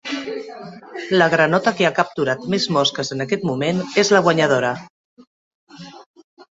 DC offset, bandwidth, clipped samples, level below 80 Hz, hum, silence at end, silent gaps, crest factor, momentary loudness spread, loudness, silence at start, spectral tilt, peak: under 0.1%; 8 kHz; under 0.1%; -62 dBFS; none; 0.1 s; 4.90-5.17 s, 5.27-5.67 s, 6.06-6.14 s, 6.24-6.37 s; 18 dB; 18 LU; -18 LUFS; 0.05 s; -4.5 dB/octave; -2 dBFS